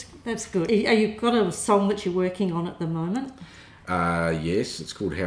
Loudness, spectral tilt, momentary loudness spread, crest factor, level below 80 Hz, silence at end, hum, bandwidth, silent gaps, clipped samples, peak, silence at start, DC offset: -25 LUFS; -5.5 dB/octave; 10 LU; 16 dB; -52 dBFS; 0 s; none; 10.5 kHz; none; under 0.1%; -8 dBFS; 0 s; under 0.1%